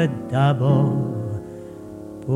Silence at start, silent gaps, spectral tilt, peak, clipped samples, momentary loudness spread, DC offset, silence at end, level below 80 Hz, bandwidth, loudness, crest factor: 0 s; none; -8.5 dB/octave; -6 dBFS; under 0.1%; 19 LU; under 0.1%; 0 s; -54 dBFS; 7.4 kHz; -21 LUFS; 16 dB